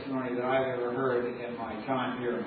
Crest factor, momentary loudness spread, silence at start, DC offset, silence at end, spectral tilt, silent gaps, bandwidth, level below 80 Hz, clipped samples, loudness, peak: 14 dB; 8 LU; 0 s; under 0.1%; 0 s; -4.5 dB/octave; none; 4.9 kHz; -68 dBFS; under 0.1%; -31 LUFS; -18 dBFS